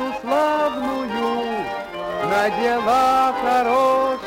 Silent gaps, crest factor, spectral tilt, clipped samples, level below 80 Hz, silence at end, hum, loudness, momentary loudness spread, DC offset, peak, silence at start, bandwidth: none; 12 dB; -4.5 dB/octave; under 0.1%; -52 dBFS; 0 s; none; -20 LUFS; 8 LU; under 0.1%; -8 dBFS; 0 s; 16.5 kHz